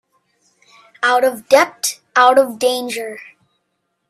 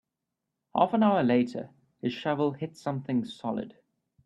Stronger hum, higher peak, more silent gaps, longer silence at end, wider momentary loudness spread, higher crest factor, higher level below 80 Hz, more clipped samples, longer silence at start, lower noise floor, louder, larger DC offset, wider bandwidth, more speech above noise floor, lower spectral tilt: neither; first, 0 dBFS vs -10 dBFS; neither; first, 0.85 s vs 0.55 s; about the same, 13 LU vs 13 LU; about the same, 18 dB vs 20 dB; about the same, -70 dBFS vs -70 dBFS; neither; first, 1 s vs 0.75 s; second, -71 dBFS vs -85 dBFS; first, -15 LUFS vs -28 LUFS; neither; first, 15.5 kHz vs 10 kHz; about the same, 56 dB vs 58 dB; second, -1 dB/octave vs -7.5 dB/octave